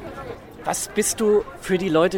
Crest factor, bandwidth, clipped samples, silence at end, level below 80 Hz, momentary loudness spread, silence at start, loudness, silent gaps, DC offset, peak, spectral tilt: 16 dB; 17 kHz; under 0.1%; 0 s; -48 dBFS; 16 LU; 0 s; -22 LUFS; none; under 0.1%; -6 dBFS; -4 dB/octave